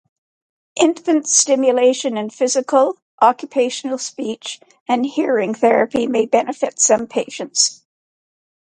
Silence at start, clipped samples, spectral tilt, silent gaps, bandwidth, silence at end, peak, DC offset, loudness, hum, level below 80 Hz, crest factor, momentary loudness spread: 0.75 s; under 0.1%; -2 dB/octave; 3.02-3.18 s, 4.80-4.86 s; 9.6 kHz; 0.95 s; 0 dBFS; under 0.1%; -17 LUFS; none; -68 dBFS; 18 dB; 10 LU